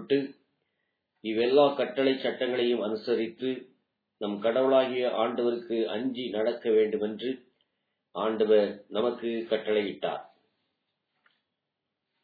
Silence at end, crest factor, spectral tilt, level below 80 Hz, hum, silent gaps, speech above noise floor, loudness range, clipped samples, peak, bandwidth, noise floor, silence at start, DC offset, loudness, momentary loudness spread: 1.95 s; 20 dB; -8 dB/octave; -82 dBFS; none; none; 57 dB; 2 LU; under 0.1%; -10 dBFS; 4.9 kHz; -84 dBFS; 0 s; under 0.1%; -28 LUFS; 11 LU